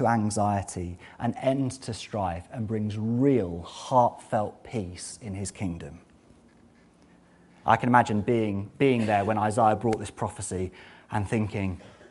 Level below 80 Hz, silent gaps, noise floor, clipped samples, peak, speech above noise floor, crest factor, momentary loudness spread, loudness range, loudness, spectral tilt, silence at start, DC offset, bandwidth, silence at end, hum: -56 dBFS; none; -57 dBFS; under 0.1%; -4 dBFS; 31 dB; 24 dB; 13 LU; 7 LU; -27 LUFS; -6 dB/octave; 0 s; under 0.1%; 11.5 kHz; 0.05 s; none